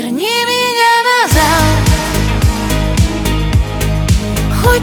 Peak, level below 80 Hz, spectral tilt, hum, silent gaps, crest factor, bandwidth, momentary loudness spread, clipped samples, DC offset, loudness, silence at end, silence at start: 0 dBFS; -18 dBFS; -4.5 dB/octave; none; none; 12 dB; over 20 kHz; 6 LU; under 0.1%; under 0.1%; -12 LUFS; 0 s; 0 s